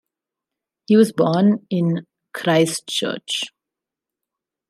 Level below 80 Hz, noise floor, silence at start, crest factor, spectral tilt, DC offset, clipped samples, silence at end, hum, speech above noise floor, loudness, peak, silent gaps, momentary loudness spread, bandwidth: -70 dBFS; -86 dBFS; 0.9 s; 18 dB; -5.5 dB/octave; under 0.1%; under 0.1%; 1.2 s; none; 68 dB; -19 LUFS; -2 dBFS; none; 10 LU; 14.5 kHz